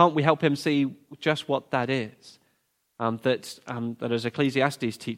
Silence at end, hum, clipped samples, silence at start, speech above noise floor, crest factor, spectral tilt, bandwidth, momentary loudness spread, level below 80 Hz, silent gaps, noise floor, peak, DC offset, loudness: 0 s; none; under 0.1%; 0 s; 47 dB; 24 dB; -6 dB/octave; 16 kHz; 9 LU; -70 dBFS; none; -73 dBFS; -4 dBFS; under 0.1%; -26 LUFS